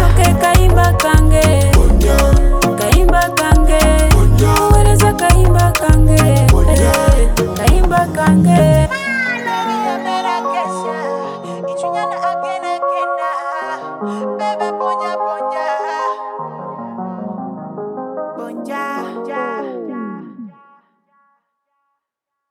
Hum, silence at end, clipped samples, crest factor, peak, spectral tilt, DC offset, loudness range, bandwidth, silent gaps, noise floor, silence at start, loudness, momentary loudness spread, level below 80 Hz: none; 2 s; under 0.1%; 12 dB; 0 dBFS; -5.5 dB/octave; under 0.1%; 14 LU; over 20 kHz; none; -79 dBFS; 0 s; -14 LUFS; 15 LU; -18 dBFS